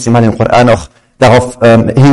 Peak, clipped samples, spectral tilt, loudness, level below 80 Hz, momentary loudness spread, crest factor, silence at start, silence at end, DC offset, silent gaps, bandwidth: 0 dBFS; 0.2%; -6.5 dB/octave; -8 LUFS; -32 dBFS; 3 LU; 6 dB; 0 s; 0 s; under 0.1%; none; 11.5 kHz